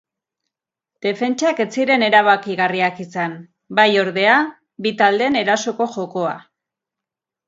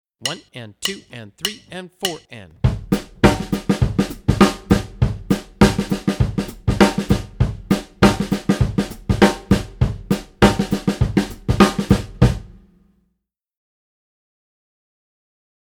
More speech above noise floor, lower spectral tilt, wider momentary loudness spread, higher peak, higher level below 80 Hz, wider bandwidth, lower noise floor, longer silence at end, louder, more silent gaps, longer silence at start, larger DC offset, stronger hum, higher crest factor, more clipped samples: first, 69 dB vs 47 dB; second, -4 dB/octave vs -6 dB/octave; about the same, 11 LU vs 10 LU; about the same, 0 dBFS vs 0 dBFS; second, -68 dBFS vs -30 dBFS; second, 7.8 kHz vs over 20 kHz; first, -86 dBFS vs -75 dBFS; second, 1.1 s vs 3.15 s; about the same, -17 LUFS vs -19 LUFS; neither; first, 1.05 s vs 0.2 s; neither; neither; about the same, 18 dB vs 20 dB; neither